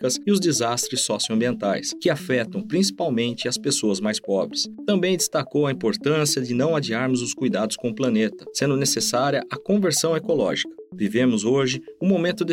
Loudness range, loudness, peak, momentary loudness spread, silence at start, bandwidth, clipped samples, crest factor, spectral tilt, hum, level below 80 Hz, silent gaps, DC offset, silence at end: 1 LU; -22 LUFS; -8 dBFS; 5 LU; 0 s; 16.5 kHz; under 0.1%; 14 dB; -4 dB/octave; none; -66 dBFS; none; under 0.1%; 0 s